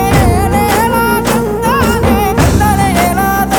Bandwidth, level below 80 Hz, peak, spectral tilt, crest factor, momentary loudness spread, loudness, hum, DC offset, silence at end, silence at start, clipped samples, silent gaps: 20 kHz; -20 dBFS; 0 dBFS; -5.5 dB/octave; 10 dB; 2 LU; -11 LUFS; none; 0.3%; 0 s; 0 s; under 0.1%; none